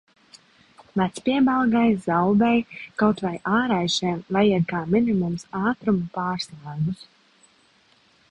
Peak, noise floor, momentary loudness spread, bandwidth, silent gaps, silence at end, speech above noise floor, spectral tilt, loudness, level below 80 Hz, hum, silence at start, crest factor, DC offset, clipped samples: -6 dBFS; -59 dBFS; 9 LU; 11 kHz; none; 1.25 s; 37 dB; -6 dB/octave; -23 LUFS; -56 dBFS; none; 0.95 s; 16 dB; under 0.1%; under 0.1%